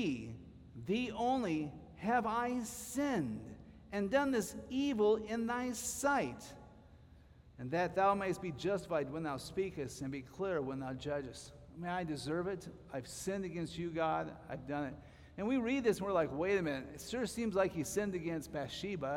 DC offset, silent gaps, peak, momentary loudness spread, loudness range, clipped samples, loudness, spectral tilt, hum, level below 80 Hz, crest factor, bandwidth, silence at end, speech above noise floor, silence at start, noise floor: under 0.1%; none; -20 dBFS; 13 LU; 5 LU; under 0.1%; -37 LUFS; -5 dB/octave; none; -62 dBFS; 18 dB; 17 kHz; 0 s; 23 dB; 0 s; -60 dBFS